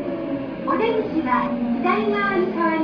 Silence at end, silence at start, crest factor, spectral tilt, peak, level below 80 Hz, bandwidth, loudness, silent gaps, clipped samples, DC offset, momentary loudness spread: 0 s; 0 s; 14 dB; -8 dB/octave; -8 dBFS; -52 dBFS; 5.4 kHz; -22 LUFS; none; under 0.1%; under 0.1%; 7 LU